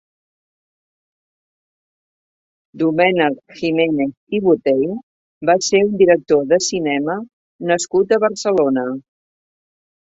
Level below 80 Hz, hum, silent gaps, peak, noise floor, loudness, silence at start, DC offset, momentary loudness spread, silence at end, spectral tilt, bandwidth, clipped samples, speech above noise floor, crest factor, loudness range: -60 dBFS; none; 4.17-4.27 s, 5.03-5.41 s, 7.33-7.59 s; 0 dBFS; under -90 dBFS; -17 LUFS; 2.75 s; under 0.1%; 10 LU; 1.15 s; -4.5 dB/octave; 8 kHz; under 0.1%; over 74 dB; 18 dB; 6 LU